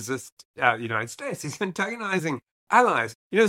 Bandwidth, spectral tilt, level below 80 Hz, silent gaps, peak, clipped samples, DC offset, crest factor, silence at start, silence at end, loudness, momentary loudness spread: 16.5 kHz; -4.5 dB/octave; -74 dBFS; 0.32-0.37 s, 0.45-0.54 s, 2.51-2.67 s, 3.15-3.30 s; -4 dBFS; under 0.1%; under 0.1%; 22 dB; 0 s; 0 s; -25 LUFS; 12 LU